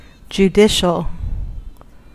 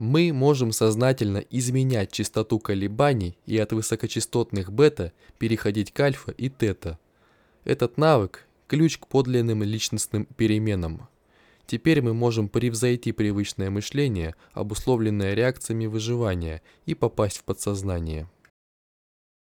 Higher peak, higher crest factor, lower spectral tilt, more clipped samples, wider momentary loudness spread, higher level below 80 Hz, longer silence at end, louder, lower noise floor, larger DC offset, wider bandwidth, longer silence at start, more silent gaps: first, -2 dBFS vs -6 dBFS; about the same, 16 dB vs 18 dB; about the same, -5 dB/octave vs -6 dB/octave; neither; first, 19 LU vs 11 LU; first, -30 dBFS vs -50 dBFS; second, 0.4 s vs 1.2 s; first, -16 LUFS vs -25 LUFS; second, -37 dBFS vs -61 dBFS; first, 0.3% vs under 0.1%; second, 15 kHz vs 19.5 kHz; first, 0.3 s vs 0 s; neither